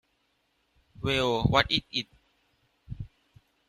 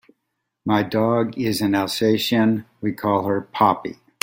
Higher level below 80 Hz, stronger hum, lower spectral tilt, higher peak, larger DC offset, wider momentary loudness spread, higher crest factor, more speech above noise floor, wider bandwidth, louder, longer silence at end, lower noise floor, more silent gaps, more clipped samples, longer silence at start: first, -48 dBFS vs -60 dBFS; neither; about the same, -5 dB/octave vs -5.5 dB/octave; second, -6 dBFS vs -2 dBFS; neither; first, 20 LU vs 8 LU; first, 26 dB vs 20 dB; second, 47 dB vs 57 dB; second, 14.5 kHz vs 16.5 kHz; second, -27 LUFS vs -21 LUFS; first, 0.65 s vs 0.3 s; second, -73 dBFS vs -77 dBFS; neither; neither; first, 1 s vs 0.65 s